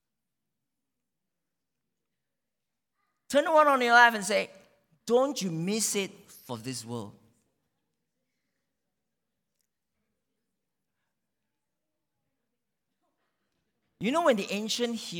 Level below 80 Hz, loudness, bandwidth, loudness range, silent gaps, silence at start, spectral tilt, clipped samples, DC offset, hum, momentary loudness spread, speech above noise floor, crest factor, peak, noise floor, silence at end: -80 dBFS; -25 LUFS; 19 kHz; 19 LU; none; 3.3 s; -3 dB/octave; under 0.1%; under 0.1%; none; 20 LU; 62 dB; 24 dB; -8 dBFS; -88 dBFS; 0 s